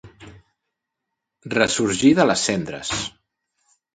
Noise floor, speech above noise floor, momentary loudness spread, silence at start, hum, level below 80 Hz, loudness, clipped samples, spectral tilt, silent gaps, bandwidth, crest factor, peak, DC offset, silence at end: -81 dBFS; 62 dB; 10 LU; 0.05 s; none; -54 dBFS; -20 LUFS; under 0.1%; -3.5 dB/octave; none; 9.4 kHz; 22 dB; -2 dBFS; under 0.1%; 0.85 s